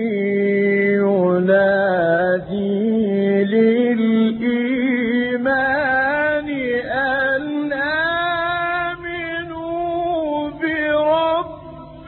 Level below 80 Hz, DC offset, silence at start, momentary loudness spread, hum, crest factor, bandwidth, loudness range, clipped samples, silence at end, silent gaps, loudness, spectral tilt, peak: -50 dBFS; under 0.1%; 0 s; 8 LU; none; 12 dB; 4.3 kHz; 4 LU; under 0.1%; 0 s; none; -18 LUFS; -11 dB/octave; -6 dBFS